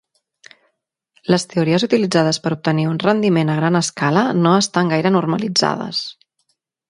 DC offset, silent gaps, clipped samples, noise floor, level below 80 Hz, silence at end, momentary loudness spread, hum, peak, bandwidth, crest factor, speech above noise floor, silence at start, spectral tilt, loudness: under 0.1%; none; under 0.1%; -71 dBFS; -60 dBFS; 0.8 s; 5 LU; none; 0 dBFS; 11.5 kHz; 18 dB; 54 dB; 1.3 s; -5 dB/octave; -17 LUFS